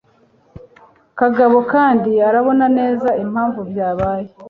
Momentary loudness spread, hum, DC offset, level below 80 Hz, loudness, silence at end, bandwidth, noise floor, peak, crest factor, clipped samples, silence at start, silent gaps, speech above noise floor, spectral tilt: 8 LU; none; under 0.1%; -48 dBFS; -15 LUFS; 0 s; 4.8 kHz; -54 dBFS; -2 dBFS; 14 dB; under 0.1%; 0.55 s; none; 40 dB; -9.5 dB/octave